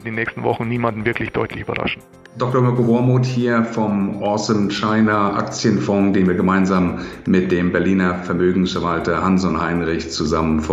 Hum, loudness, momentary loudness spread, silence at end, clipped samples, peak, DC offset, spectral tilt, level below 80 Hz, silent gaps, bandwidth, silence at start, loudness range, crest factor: none; -18 LUFS; 7 LU; 0 s; under 0.1%; -2 dBFS; under 0.1%; -6.5 dB/octave; -42 dBFS; none; 8 kHz; 0 s; 2 LU; 16 dB